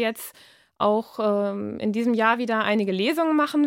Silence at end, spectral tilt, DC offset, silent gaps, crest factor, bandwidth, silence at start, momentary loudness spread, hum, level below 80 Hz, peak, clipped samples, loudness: 0 s; -5.5 dB/octave; under 0.1%; none; 16 dB; 17 kHz; 0 s; 7 LU; none; -70 dBFS; -6 dBFS; under 0.1%; -23 LUFS